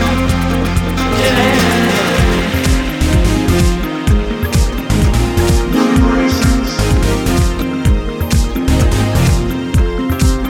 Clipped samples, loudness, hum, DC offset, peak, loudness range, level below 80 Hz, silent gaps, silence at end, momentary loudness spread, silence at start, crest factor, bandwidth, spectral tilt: under 0.1%; -14 LUFS; none; under 0.1%; 0 dBFS; 1 LU; -16 dBFS; none; 0 s; 4 LU; 0 s; 12 dB; 17.5 kHz; -5.5 dB/octave